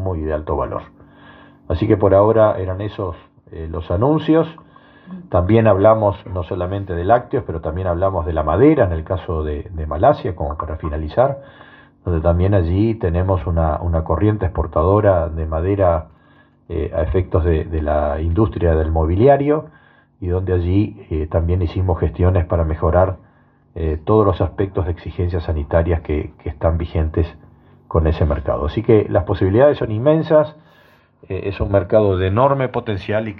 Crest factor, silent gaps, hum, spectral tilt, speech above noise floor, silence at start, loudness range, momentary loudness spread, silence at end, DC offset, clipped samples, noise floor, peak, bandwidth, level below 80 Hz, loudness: 16 dB; none; none; -11.5 dB/octave; 36 dB; 0 s; 3 LU; 12 LU; 0 s; under 0.1%; under 0.1%; -52 dBFS; 0 dBFS; 4.7 kHz; -32 dBFS; -18 LUFS